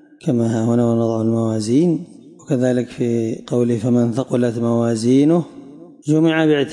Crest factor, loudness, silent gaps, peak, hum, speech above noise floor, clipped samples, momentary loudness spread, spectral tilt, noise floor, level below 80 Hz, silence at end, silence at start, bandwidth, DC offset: 12 dB; -18 LUFS; none; -6 dBFS; none; 22 dB; under 0.1%; 7 LU; -7 dB/octave; -39 dBFS; -62 dBFS; 0 s; 0.25 s; 11.5 kHz; under 0.1%